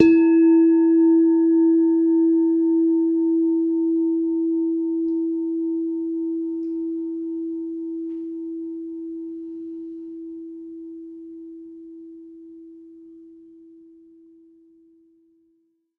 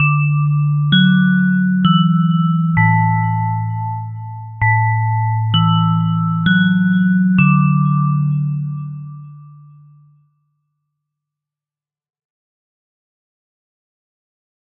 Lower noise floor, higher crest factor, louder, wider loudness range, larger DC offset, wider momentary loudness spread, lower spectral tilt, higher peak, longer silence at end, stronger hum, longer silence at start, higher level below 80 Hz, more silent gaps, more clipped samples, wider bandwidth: second, -67 dBFS vs under -90 dBFS; first, 22 dB vs 16 dB; second, -20 LUFS vs -15 LUFS; first, 22 LU vs 8 LU; neither; first, 23 LU vs 12 LU; first, -8.5 dB/octave vs -5.5 dB/octave; about the same, 0 dBFS vs 0 dBFS; second, 2.7 s vs 5.25 s; neither; about the same, 0 s vs 0 s; second, -66 dBFS vs -50 dBFS; neither; neither; second, 2.8 kHz vs 3.8 kHz